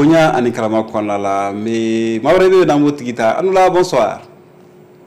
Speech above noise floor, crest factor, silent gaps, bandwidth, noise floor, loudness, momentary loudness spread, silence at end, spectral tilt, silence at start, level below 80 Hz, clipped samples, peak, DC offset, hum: 29 dB; 8 dB; none; 13.5 kHz; -42 dBFS; -14 LUFS; 8 LU; 0.85 s; -6 dB/octave; 0 s; -46 dBFS; under 0.1%; -6 dBFS; under 0.1%; none